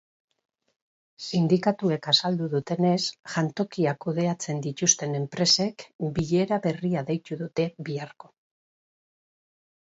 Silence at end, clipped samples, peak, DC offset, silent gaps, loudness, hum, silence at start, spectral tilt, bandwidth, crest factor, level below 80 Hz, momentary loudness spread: 1.8 s; under 0.1%; -6 dBFS; under 0.1%; 5.94-5.99 s; -26 LUFS; none; 1.2 s; -4 dB/octave; 8 kHz; 22 dB; -62 dBFS; 10 LU